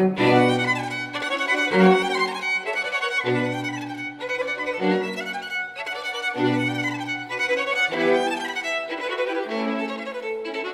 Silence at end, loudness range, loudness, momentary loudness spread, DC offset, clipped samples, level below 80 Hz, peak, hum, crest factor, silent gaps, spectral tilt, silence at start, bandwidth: 0 s; 4 LU; -23 LUFS; 11 LU; under 0.1%; under 0.1%; -68 dBFS; -4 dBFS; none; 20 dB; none; -5 dB/octave; 0 s; 14 kHz